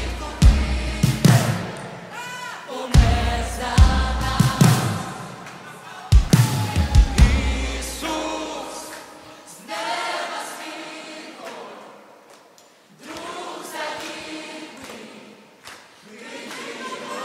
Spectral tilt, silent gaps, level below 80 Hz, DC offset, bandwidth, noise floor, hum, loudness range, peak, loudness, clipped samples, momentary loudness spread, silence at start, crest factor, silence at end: -5 dB/octave; none; -26 dBFS; under 0.1%; 16 kHz; -51 dBFS; none; 14 LU; -2 dBFS; -21 LUFS; under 0.1%; 21 LU; 0 s; 20 dB; 0 s